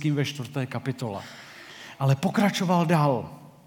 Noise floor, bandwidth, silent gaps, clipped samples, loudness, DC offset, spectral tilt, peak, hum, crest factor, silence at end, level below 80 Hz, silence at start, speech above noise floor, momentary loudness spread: -44 dBFS; 18 kHz; none; under 0.1%; -25 LUFS; under 0.1%; -6.5 dB/octave; -8 dBFS; none; 18 dB; 0.15 s; -70 dBFS; 0 s; 19 dB; 20 LU